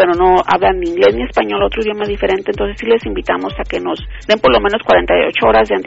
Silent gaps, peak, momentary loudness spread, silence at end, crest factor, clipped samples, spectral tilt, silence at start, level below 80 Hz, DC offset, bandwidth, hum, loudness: none; 0 dBFS; 9 LU; 0 s; 14 dB; under 0.1%; -2.5 dB/octave; 0 s; -30 dBFS; under 0.1%; 8 kHz; none; -14 LUFS